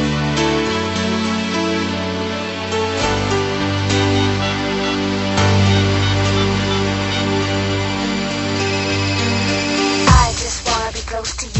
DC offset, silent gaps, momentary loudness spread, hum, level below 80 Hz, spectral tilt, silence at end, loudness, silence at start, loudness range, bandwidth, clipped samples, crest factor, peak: under 0.1%; none; 6 LU; none; -30 dBFS; -4.5 dB/octave; 0 s; -17 LUFS; 0 s; 2 LU; 8.4 kHz; under 0.1%; 18 dB; 0 dBFS